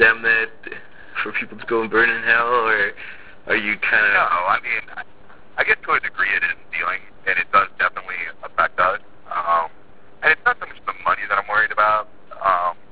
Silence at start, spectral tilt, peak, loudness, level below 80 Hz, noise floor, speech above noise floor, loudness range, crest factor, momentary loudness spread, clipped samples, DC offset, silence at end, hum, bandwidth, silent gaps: 0 s; -6.5 dB/octave; -2 dBFS; -19 LUFS; -54 dBFS; -49 dBFS; 30 dB; 3 LU; 20 dB; 14 LU; under 0.1%; 1%; 0.2 s; none; 4 kHz; none